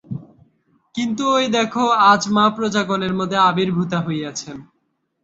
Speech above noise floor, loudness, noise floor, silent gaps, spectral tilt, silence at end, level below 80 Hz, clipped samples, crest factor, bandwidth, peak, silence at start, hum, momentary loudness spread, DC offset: 43 dB; -18 LUFS; -61 dBFS; none; -4.5 dB/octave; 0.6 s; -58 dBFS; under 0.1%; 18 dB; 8 kHz; -2 dBFS; 0.1 s; none; 18 LU; under 0.1%